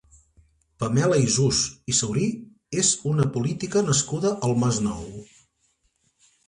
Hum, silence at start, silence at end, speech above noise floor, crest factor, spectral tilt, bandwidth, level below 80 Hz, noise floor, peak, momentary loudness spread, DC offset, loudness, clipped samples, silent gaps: none; 0.8 s; 1.25 s; 46 dB; 18 dB; -4.5 dB/octave; 11.5 kHz; -52 dBFS; -69 dBFS; -8 dBFS; 11 LU; under 0.1%; -23 LUFS; under 0.1%; none